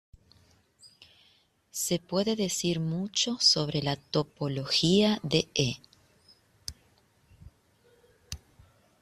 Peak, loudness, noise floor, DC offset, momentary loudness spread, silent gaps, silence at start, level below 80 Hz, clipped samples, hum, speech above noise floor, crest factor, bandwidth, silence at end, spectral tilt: -8 dBFS; -27 LUFS; -66 dBFS; under 0.1%; 20 LU; none; 0.85 s; -60 dBFS; under 0.1%; none; 38 dB; 22 dB; 14 kHz; 0.65 s; -4 dB/octave